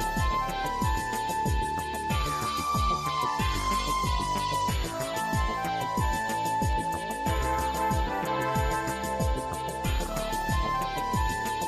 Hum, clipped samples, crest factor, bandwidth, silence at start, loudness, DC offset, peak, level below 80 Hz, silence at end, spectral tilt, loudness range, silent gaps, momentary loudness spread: none; under 0.1%; 12 dB; 14.5 kHz; 0 s; -29 LUFS; under 0.1%; -16 dBFS; -36 dBFS; 0 s; -4.5 dB/octave; 1 LU; none; 3 LU